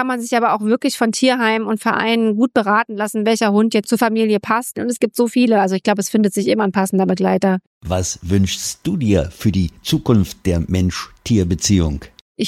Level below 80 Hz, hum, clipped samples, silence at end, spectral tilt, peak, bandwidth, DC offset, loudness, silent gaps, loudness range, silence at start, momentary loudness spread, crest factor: -38 dBFS; none; under 0.1%; 0 s; -5 dB/octave; -2 dBFS; 15.5 kHz; under 0.1%; -17 LUFS; 7.67-7.81 s, 12.21-12.35 s; 2 LU; 0 s; 6 LU; 16 dB